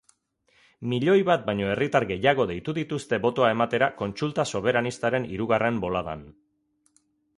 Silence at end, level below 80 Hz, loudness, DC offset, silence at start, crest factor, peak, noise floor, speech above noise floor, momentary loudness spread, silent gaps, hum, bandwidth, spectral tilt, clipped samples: 1.05 s; -56 dBFS; -25 LUFS; under 0.1%; 0.8 s; 20 dB; -6 dBFS; -67 dBFS; 42 dB; 8 LU; none; none; 11.5 kHz; -6 dB/octave; under 0.1%